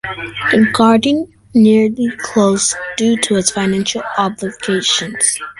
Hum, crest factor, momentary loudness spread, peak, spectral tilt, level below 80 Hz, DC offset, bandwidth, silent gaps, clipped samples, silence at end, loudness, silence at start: none; 14 dB; 8 LU; 0 dBFS; -3.5 dB/octave; -50 dBFS; under 0.1%; 11.5 kHz; none; under 0.1%; 0.1 s; -14 LUFS; 0.05 s